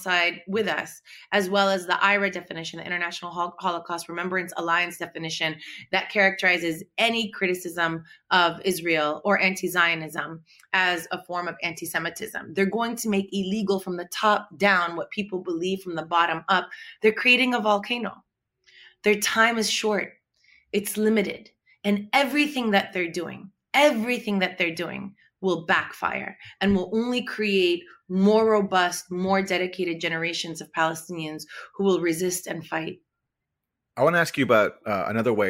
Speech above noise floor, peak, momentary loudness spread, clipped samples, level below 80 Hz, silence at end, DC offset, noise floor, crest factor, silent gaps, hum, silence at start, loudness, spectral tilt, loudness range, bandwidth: 59 dB; -6 dBFS; 12 LU; under 0.1%; -64 dBFS; 0 s; under 0.1%; -83 dBFS; 18 dB; none; none; 0 s; -24 LUFS; -4 dB/octave; 4 LU; 16 kHz